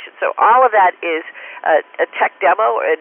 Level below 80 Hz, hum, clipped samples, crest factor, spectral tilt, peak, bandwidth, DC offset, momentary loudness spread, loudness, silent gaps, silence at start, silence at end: under -90 dBFS; none; under 0.1%; 14 dB; -7 dB/octave; -2 dBFS; 3.6 kHz; under 0.1%; 11 LU; -15 LUFS; none; 0 s; 0.05 s